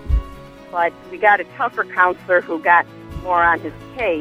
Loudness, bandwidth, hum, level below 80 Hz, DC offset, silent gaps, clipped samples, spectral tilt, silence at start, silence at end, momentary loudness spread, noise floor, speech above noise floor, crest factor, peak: -18 LUFS; 12 kHz; none; -30 dBFS; under 0.1%; none; under 0.1%; -7 dB/octave; 0 s; 0 s; 13 LU; -37 dBFS; 19 dB; 18 dB; 0 dBFS